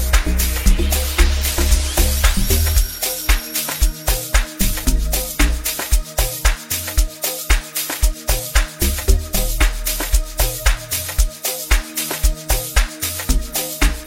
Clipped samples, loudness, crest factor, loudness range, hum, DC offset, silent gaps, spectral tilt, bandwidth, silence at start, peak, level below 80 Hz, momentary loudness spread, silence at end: under 0.1%; -19 LUFS; 16 dB; 2 LU; none; under 0.1%; none; -3 dB/octave; 16.5 kHz; 0 s; 0 dBFS; -18 dBFS; 4 LU; 0 s